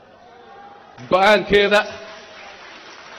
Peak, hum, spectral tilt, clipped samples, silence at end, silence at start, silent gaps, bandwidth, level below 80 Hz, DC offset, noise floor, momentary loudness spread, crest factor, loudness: -4 dBFS; none; -4 dB/octave; under 0.1%; 0 s; 1 s; none; 15 kHz; -50 dBFS; under 0.1%; -45 dBFS; 24 LU; 16 dB; -16 LUFS